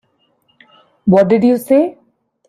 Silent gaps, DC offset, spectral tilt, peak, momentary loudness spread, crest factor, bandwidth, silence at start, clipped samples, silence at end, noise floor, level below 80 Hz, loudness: none; under 0.1%; -8 dB/octave; -2 dBFS; 10 LU; 14 dB; 15 kHz; 1.05 s; under 0.1%; 0.55 s; -60 dBFS; -54 dBFS; -13 LUFS